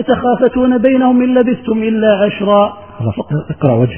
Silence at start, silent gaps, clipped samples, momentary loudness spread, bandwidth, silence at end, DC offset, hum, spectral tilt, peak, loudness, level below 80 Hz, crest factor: 0 s; none; under 0.1%; 9 LU; 3.3 kHz; 0 s; 0.4%; none; -11.5 dB/octave; 0 dBFS; -13 LUFS; -42 dBFS; 12 dB